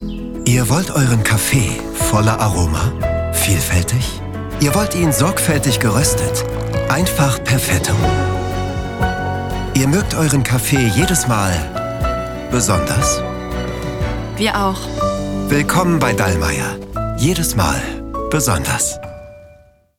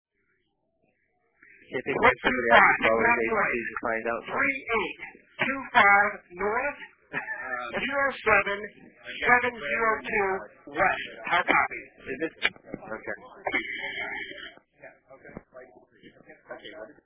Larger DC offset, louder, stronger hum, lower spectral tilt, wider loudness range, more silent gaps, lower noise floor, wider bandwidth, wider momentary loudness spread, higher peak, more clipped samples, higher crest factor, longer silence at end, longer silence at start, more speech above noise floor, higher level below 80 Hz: neither; first, -17 LUFS vs -25 LUFS; neither; first, -4.5 dB/octave vs -1 dB/octave; second, 3 LU vs 12 LU; neither; second, -47 dBFS vs -74 dBFS; first, 18.5 kHz vs 4 kHz; second, 8 LU vs 20 LU; first, 0 dBFS vs -4 dBFS; neither; second, 16 dB vs 24 dB; first, 0.45 s vs 0.15 s; second, 0 s vs 1.7 s; second, 32 dB vs 48 dB; first, -30 dBFS vs -58 dBFS